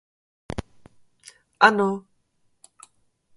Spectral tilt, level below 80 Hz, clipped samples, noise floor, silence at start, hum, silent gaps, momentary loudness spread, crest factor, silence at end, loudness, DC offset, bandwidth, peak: -5 dB/octave; -52 dBFS; under 0.1%; -67 dBFS; 0.5 s; none; none; 18 LU; 26 dB; 1.35 s; -20 LUFS; under 0.1%; 11.5 kHz; -2 dBFS